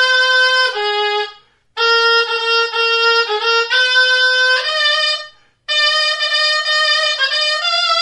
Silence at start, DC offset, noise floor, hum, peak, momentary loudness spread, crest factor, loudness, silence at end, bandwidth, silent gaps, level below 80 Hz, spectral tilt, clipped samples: 0 s; under 0.1%; -41 dBFS; none; -2 dBFS; 6 LU; 14 dB; -13 LUFS; 0 s; 11.5 kHz; none; -66 dBFS; 2.5 dB/octave; under 0.1%